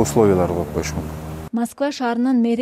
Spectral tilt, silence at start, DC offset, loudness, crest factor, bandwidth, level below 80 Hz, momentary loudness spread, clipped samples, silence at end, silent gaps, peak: -6 dB/octave; 0 s; under 0.1%; -20 LUFS; 18 dB; 16 kHz; -38 dBFS; 12 LU; under 0.1%; 0 s; none; -2 dBFS